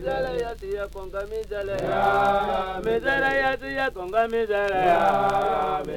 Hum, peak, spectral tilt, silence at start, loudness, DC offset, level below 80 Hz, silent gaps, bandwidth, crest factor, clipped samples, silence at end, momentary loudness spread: 50 Hz at -45 dBFS; -8 dBFS; -5.5 dB/octave; 0 s; -24 LUFS; under 0.1%; -44 dBFS; none; 16.5 kHz; 16 dB; under 0.1%; 0 s; 11 LU